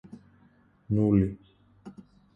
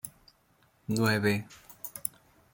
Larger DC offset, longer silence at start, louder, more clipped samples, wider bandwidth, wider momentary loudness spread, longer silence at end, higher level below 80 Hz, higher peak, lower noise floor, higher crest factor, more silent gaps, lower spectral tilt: neither; first, 0.9 s vs 0.05 s; first, -26 LUFS vs -30 LUFS; neither; second, 3.6 kHz vs 17 kHz; first, 25 LU vs 19 LU; about the same, 0.45 s vs 0.45 s; first, -50 dBFS vs -66 dBFS; second, -12 dBFS vs -8 dBFS; second, -61 dBFS vs -67 dBFS; second, 18 dB vs 24 dB; neither; first, -11.5 dB/octave vs -5 dB/octave